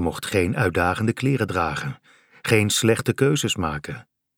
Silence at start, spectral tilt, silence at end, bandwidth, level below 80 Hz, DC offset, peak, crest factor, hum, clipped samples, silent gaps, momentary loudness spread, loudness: 0 s; -4.5 dB/octave; 0.35 s; 17.5 kHz; -46 dBFS; under 0.1%; -4 dBFS; 20 dB; none; under 0.1%; none; 13 LU; -22 LUFS